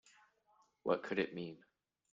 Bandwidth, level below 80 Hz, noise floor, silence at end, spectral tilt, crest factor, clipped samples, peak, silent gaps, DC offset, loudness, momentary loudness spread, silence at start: 7.6 kHz; -80 dBFS; -74 dBFS; 0.55 s; -6.5 dB/octave; 22 dB; under 0.1%; -20 dBFS; none; under 0.1%; -40 LUFS; 13 LU; 0.85 s